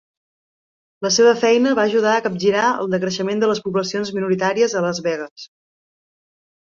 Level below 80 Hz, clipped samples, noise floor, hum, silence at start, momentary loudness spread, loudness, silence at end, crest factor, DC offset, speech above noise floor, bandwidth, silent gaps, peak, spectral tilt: -64 dBFS; under 0.1%; under -90 dBFS; none; 1 s; 9 LU; -18 LUFS; 1.2 s; 16 dB; under 0.1%; over 72 dB; 7.6 kHz; 5.31-5.36 s; -4 dBFS; -4 dB/octave